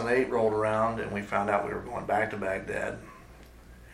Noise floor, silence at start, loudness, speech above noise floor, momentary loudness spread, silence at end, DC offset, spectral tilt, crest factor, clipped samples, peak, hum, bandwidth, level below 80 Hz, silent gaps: -50 dBFS; 0 s; -29 LUFS; 22 dB; 9 LU; 0 s; under 0.1%; -6.5 dB/octave; 20 dB; under 0.1%; -10 dBFS; none; 14.5 kHz; -52 dBFS; none